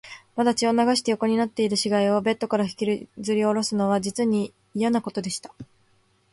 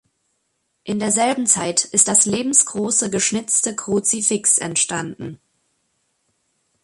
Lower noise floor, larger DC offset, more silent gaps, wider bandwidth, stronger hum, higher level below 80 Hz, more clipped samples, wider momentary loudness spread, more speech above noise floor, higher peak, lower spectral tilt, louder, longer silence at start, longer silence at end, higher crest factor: second, -63 dBFS vs -71 dBFS; neither; neither; about the same, 11.5 kHz vs 11.5 kHz; neither; about the same, -64 dBFS vs -60 dBFS; neither; second, 9 LU vs 13 LU; second, 40 dB vs 52 dB; second, -8 dBFS vs 0 dBFS; first, -4.5 dB/octave vs -2.5 dB/octave; second, -24 LUFS vs -17 LUFS; second, 0.05 s vs 0.85 s; second, 0.7 s vs 1.5 s; about the same, 16 dB vs 20 dB